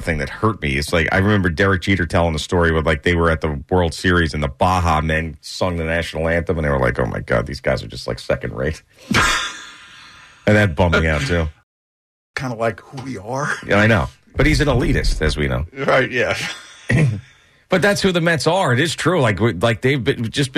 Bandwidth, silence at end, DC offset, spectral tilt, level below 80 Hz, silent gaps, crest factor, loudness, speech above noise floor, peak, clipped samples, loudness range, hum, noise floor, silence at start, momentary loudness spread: 13.5 kHz; 0 s; under 0.1%; -5.5 dB/octave; -30 dBFS; 11.63-12.34 s; 14 dB; -18 LUFS; 25 dB; -4 dBFS; under 0.1%; 3 LU; none; -43 dBFS; 0 s; 10 LU